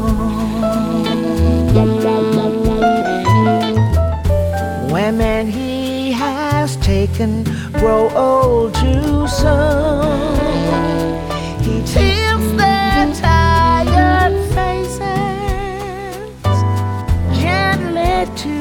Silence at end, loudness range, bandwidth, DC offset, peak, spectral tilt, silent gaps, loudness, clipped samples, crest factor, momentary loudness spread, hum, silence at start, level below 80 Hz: 0 s; 4 LU; 17.5 kHz; under 0.1%; 0 dBFS; -6.5 dB/octave; none; -15 LUFS; under 0.1%; 14 dB; 7 LU; none; 0 s; -24 dBFS